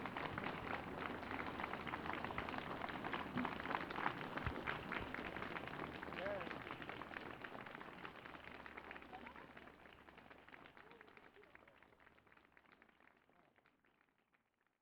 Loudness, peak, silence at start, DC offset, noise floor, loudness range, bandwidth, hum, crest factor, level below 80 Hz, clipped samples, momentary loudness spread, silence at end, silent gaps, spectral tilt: -47 LUFS; -22 dBFS; 0 s; under 0.1%; -82 dBFS; 19 LU; 19.5 kHz; none; 26 dB; -68 dBFS; under 0.1%; 20 LU; 1.1 s; none; -6 dB/octave